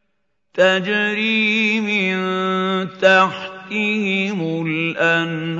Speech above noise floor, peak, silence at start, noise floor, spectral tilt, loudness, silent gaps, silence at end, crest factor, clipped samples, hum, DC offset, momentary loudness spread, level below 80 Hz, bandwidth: 55 dB; 0 dBFS; 0.55 s; -73 dBFS; -5.5 dB/octave; -17 LUFS; none; 0 s; 18 dB; under 0.1%; none; under 0.1%; 7 LU; -70 dBFS; 7.8 kHz